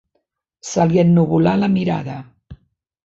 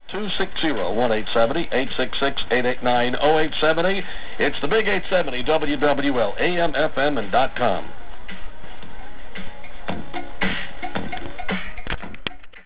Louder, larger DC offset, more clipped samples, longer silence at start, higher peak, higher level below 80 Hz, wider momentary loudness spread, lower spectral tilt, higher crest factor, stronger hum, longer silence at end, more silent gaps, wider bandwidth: first, -16 LUFS vs -22 LUFS; second, under 0.1% vs 8%; neither; first, 0.65 s vs 0 s; about the same, -2 dBFS vs -4 dBFS; second, -48 dBFS vs -42 dBFS; about the same, 18 LU vs 18 LU; about the same, -7.5 dB/octave vs -8.5 dB/octave; about the same, 16 dB vs 18 dB; neither; first, 0.5 s vs 0 s; neither; first, 7.8 kHz vs 4 kHz